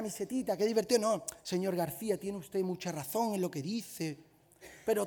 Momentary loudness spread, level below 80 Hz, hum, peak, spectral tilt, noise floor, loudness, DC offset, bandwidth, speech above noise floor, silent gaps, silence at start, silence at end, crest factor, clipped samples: 10 LU; -72 dBFS; none; -14 dBFS; -5 dB/octave; -57 dBFS; -34 LUFS; under 0.1%; over 20 kHz; 23 dB; none; 0 s; 0 s; 20 dB; under 0.1%